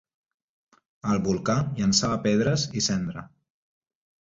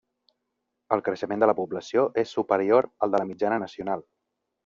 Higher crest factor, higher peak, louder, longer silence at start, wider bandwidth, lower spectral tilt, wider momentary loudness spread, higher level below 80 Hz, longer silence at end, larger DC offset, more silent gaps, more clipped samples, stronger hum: about the same, 20 dB vs 22 dB; about the same, -6 dBFS vs -4 dBFS; about the same, -25 LUFS vs -26 LUFS; first, 1.05 s vs 0.9 s; about the same, 7.8 kHz vs 7.4 kHz; about the same, -4.5 dB/octave vs -4.5 dB/octave; about the same, 10 LU vs 9 LU; first, -52 dBFS vs -70 dBFS; first, 1 s vs 0.65 s; neither; neither; neither; neither